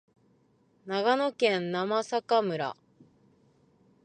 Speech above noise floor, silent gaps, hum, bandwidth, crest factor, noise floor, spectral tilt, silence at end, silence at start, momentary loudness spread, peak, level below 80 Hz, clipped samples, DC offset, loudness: 39 dB; none; none; 9.6 kHz; 20 dB; -66 dBFS; -5 dB/octave; 1.3 s; 0.85 s; 10 LU; -12 dBFS; -80 dBFS; under 0.1%; under 0.1%; -28 LUFS